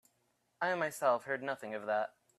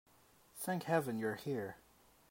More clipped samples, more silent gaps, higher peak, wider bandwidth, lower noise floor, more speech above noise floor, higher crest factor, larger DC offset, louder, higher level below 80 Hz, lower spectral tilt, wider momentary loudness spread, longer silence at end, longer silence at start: neither; neither; about the same, -18 dBFS vs -20 dBFS; about the same, 15 kHz vs 16 kHz; first, -78 dBFS vs -68 dBFS; first, 43 dB vs 30 dB; about the same, 18 dB vs 20 dB; neither; first, -35 LUFS vs -39 LUFS; second, -86 dBFS vs -78 dBFS; second, -4 dB/octave vs -5.5 dB/octave; second, 7 LU vs 17 LU; second, 0.3 s vs 0.55 s; about the same, 0.6 s vs 0.55 s